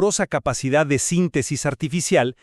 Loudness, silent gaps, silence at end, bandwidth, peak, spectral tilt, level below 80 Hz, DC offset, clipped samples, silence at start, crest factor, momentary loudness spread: -21 LUFS; none; 0.1 s; 13.5 kHz; -4 dBFS; -4.5 dB/octave; -48 dBFS; under 0.1%; under 0.1%; 0 s; 16 dB; 5 LU